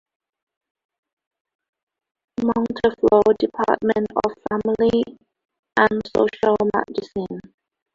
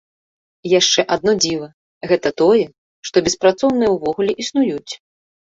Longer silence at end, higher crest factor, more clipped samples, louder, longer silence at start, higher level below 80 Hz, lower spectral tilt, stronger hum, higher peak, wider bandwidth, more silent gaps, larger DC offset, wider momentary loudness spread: about the same, 0.55 s vs 0.45 s; about the same, 20 dB vs 16 dB; neither; second, -20 LUFS vs -17 LUFS; first, 2.4 s vs 0.65 s; about the same, -54 dBFS vs -54 dBFS; first, -7 dB/octave vs -3.5 dB/octave; neither; about the same, -2 dBFS vs -2 dBFS; about the same, 7.4 kHz vs 8 kHz; second, 5.59-5.63 s vs 1.74-2.01 s, 2.78-3.03 s; neither; second, 13 LU vs 18 LU